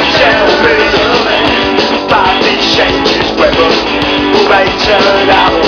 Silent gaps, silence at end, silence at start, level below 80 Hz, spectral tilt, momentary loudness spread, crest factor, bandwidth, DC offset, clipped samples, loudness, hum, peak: none; 0 s; 0 s; -30 dBFS; -4 dB/octave; 3 LU; 8 dB; 5.4 kHz; under 0.1%; under 0.1%; -8 LUFS; none; 0 dBFS